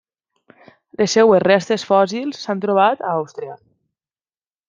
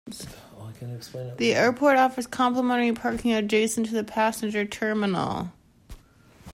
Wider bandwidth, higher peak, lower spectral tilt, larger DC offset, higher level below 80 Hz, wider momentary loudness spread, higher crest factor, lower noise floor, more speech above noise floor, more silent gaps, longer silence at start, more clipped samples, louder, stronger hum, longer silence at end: second, 9.2 kHz vs 16 kHz; first, -2 dBFS vs -8 dBFS; about the same, -4.5 dB/octave vs -4.5 dB/octave; neither; second, -66 dBFS vs -54 dBFS; about the same, 17 LU vs 18 LU; about the same, 18 dB vs 16 dB; first, under -90 dBFS vs -54 dBFS; first, over 73 dB vs 30 dB; neither; first, 1 s vs 0.05 s; neither; first, -17 LUFS vs -24 LUFS; neither; first, 1.15 s vs 0.05 s